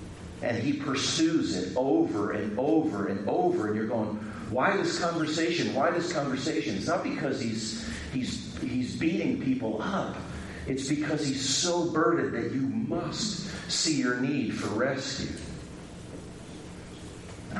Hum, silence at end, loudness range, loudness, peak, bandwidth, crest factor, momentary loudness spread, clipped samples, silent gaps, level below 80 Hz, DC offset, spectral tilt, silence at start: none; 0 s; 3 LU; -29 LUFS; -12 dBFS; 11.5 kHz; 18 dB; 16 LU; under 0.1%; none; -54 dBFS; under 0.1%; -4.5 dB/octave; 0 s